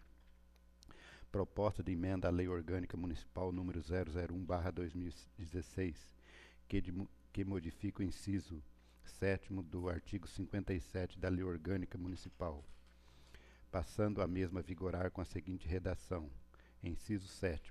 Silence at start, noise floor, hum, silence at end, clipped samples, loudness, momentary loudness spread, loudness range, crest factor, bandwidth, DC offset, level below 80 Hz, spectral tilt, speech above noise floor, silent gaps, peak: 0 s; -65 dBFS; none; 0 s; under 0.1%; -43 LUFS; 15 LU; 4 LU; 20 dB; 13 kHz; under 0.1%; -54 dBFS; -7.5 dB/octave; 24 dB; none; -22 dBFS